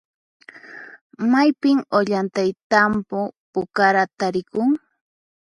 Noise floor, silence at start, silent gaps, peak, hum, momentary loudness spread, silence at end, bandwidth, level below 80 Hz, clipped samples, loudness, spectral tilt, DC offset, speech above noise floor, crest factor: -41 dBFS; 0.55 s; 1.01-1.10 s, 2.63-2.70 s, 3.37-3.53 s; -2 dBFS; none; 11 LU; 0.8 s; 11.5 kHz; -60 dBFS; under 0.1%; -20 LUFS; -6 dB/octave; under 0.1%; 22 dB; 20 dB